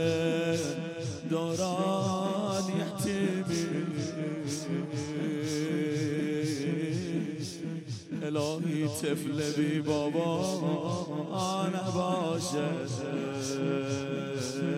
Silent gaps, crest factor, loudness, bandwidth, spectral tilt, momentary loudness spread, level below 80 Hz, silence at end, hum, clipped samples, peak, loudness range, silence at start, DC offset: none; 16 dB; -32 LUFS; 15.5 kHz; -5.5 dB/octave; 5 LU; -72 dBFS; 0 s; none; under 0.1%; -16 dBFS; 2 LU; 0 s; under 0.1%